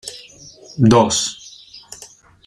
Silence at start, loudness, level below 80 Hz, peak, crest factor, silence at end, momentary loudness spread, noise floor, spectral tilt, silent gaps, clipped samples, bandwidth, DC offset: 0.05 s; -15 LUFS; -50 dBFS; -2 dBFS; 18 dB; 0.4 s; 24 LU; -44 dBFS; -5 dB/octave; none; under 0.1%; 13.5 kHz; under 0.1%